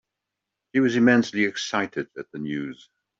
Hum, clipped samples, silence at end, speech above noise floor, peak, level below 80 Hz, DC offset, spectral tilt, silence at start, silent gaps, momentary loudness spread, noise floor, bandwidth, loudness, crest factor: none; under 0.1%; 0.45 s; 61 dB; -6 dBFS; -68 dBFS; under 0.1%; -5 dB/octave; 0.75 s; none; 15 LU; -84 dBFS; 7.8 kHz; -23 LUFS; 18 dB